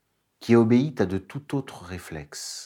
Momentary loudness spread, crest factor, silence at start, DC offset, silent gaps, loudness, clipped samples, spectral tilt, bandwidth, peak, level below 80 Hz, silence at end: 19 LU; 20 dB; 0.4 s; under 0.1%; none; -24 LUFS; under 0.1%; -6.5 dB/octave; 15.5 kHz; -6 dBFS; -60 dBFS; 0 s